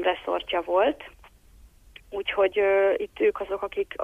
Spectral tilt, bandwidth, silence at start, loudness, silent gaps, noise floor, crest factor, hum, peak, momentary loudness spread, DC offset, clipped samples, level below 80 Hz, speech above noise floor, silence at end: -5 dB/octave; 7.4 kHz; 0 s; -25 LUFS; none; -53 dBFS; 16 dB; none; -10 dBFS; 11 LU; under 0.1%; under 0.1%; -56 dBFS; 28 dB; 0 s